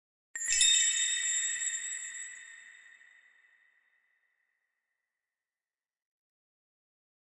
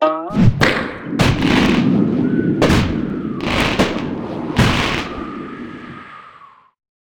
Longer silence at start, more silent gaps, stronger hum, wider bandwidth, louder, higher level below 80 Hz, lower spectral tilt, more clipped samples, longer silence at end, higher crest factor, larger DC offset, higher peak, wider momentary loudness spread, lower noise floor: first, 0.35 s vs 0 s; neither; neither; second, 11.5 kHz vs 18 kHz; second, -27 LUFS vs -17 LUFS; second, -70 dBFS vs -32 dBFS; second, 6 dB/octave vs -6 dB/octave; neither; first, 4.5 s vs 0.65 s; first, 24 dB vs 16 dB; neither; second, -12 dBFS vs 0 dBFS; first, 21 LU vs 16 LU; first, under -90 dBFS vs -44 dBFS